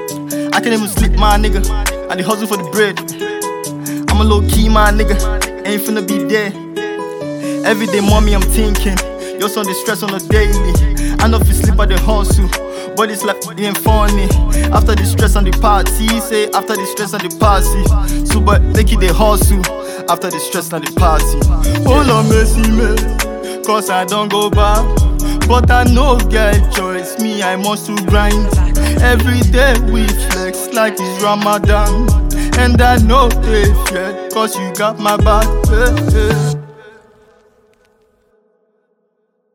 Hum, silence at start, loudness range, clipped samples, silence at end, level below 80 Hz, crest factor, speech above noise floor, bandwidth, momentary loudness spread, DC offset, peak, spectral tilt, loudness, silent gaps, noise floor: none; 0 s; 3 LU; under 0.1%; 2.65 s; -16 dBFS; 12 dB; 52 dB; 18.5 kHz; 8 LU; under 0.1%; 0 dBFS; -5 dB/octave; -13 LUFS; none; -63 dBFS